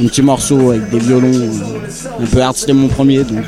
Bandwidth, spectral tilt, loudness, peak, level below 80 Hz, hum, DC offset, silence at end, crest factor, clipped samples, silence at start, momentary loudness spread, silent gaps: 14.5 kHz; -5.5 dB/octave; -12 LUFS; 0 dBFS; -32 dBFS; none; under 0.1%; 0 s; 10 dB; under 0.1%; 0 s; 10 LU; none